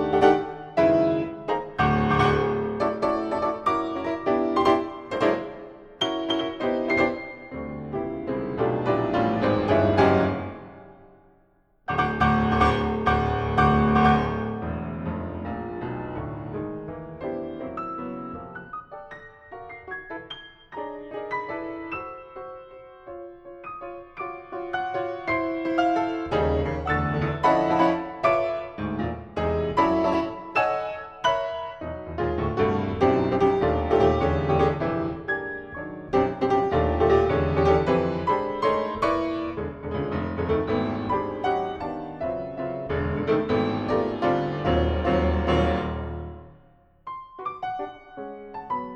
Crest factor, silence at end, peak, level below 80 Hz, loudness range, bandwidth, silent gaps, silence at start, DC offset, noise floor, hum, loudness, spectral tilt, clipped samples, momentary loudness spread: 20 dB; 0 s; -4 dBFS; -40 dBFS; 12 LU; 8.8 kHz; none; 0 s; under 0.1%; -62 dBFS; none; -25 LUFS; -7.5 dB/octave; under 0.1%; 17 LU